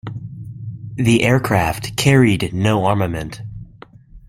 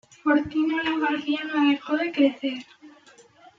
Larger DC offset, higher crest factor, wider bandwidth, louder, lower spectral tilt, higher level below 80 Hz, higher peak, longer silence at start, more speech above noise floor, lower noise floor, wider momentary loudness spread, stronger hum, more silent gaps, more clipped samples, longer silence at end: neither; about the same, 18 dB vs 18 dB; first, 16 kHz vs 7.4 kHz; first, -16 LUFS vs -24 LUFS; about the same, -6 dB/octave vs -5 dB/octave; first, -42 dBFS vs -62 dBFS; first, 0 dBFS vs -8 dBFS; second, 0.05 s vs 0.25 s; about the same, 27 dB vs 30 dB; second, -43 dBFS vs -54 dBFS; first, 19 LU vs 7 LU; neither; neither; neither; second, 0.1 s vs 0.7 s